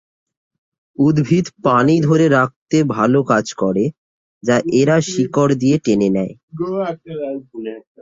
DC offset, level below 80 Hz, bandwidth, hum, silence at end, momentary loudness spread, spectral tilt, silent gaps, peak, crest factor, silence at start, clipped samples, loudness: under 0.1%; -54 dBFS; 7.8 kHz; none; 0.25 s; 13 LU; -6.5 dB/octave; 2.56-2.66 s, 3.98-4.41 s, 6.43-6.48 s; 0 dBFS; 16 dB; 1 s; under 0.1%; -16 LUFS